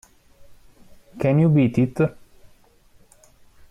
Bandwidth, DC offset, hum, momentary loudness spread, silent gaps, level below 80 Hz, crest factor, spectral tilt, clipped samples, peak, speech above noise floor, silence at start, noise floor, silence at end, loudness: 10 kHz; under 0.1%; none; 8 LU; none; -54 dBFS; 16 dB; -9.5 dB/octave; under 0.1%; -8 dBFS; 36 dB; 0.5 s; -54 dBFS; 1.6 s; -20 LUFS